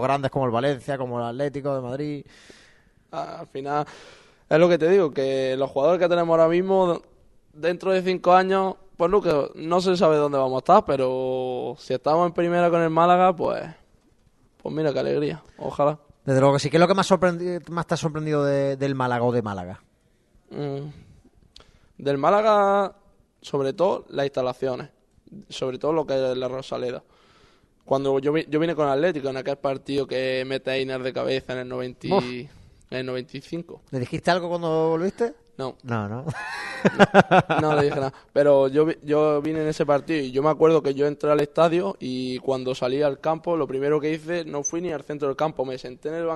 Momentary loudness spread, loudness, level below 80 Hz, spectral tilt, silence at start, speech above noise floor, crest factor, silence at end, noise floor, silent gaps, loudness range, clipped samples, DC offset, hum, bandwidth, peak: 13 LU; -23 LUFS; -58 dBFS; -6 dB/octave; 0 s; 40 dB; 22 dB; 0 s; -63 dBFS; none; 7 LU; under 0.1%; under 0.1%; none; 12 kHz; 0 dBFS